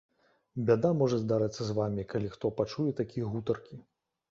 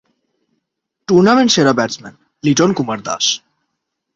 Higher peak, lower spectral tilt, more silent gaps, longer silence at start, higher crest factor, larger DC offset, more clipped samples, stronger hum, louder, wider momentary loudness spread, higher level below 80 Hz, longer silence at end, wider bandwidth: second, -12 dBFS vs -2 dBFS; first, -7.5 dB/octave vs -4 dB/octave; neither; second, 0.55 s vs 1.1 s; about the same, 20 dB vs 16 dB; neither; neither; neither; second, -31 LUFS vs -14 LUFS; second, 9 LU vs 12 LU; about the same, -60 dBFS vs -56 dBFS; second, 0.5 s vs 0.8 s; about the same, 7.6 kHz vs 7.8 kHz